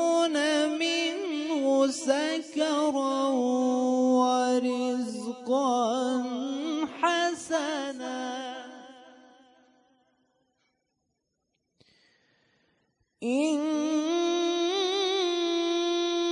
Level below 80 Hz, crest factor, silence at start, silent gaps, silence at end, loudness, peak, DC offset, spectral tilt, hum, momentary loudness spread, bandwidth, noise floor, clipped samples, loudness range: -82 dBFS; 18 dB; 0 s; none; 0 s; -27 LUFS; -10 dBFS; under 0.1%; -2.5 dB/octave; none; 9 LU; 11 kHz; -80 dBFS; under 0.1%; 10 LU